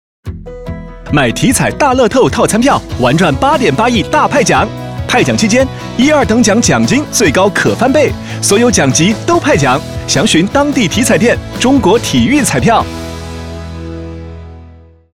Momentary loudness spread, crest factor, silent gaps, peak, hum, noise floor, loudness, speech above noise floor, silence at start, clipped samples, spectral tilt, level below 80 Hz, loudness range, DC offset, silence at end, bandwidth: 16 LU; 10 dB; none; 0 dBFS; none; -37 dBFS; -10 LUFS; 27 dB; 0.25 s; under 0.1%; -4.5 dB/octave; -30 dBFS; 2 LU; under 0.1%; 0.45 s; 16.5 kHz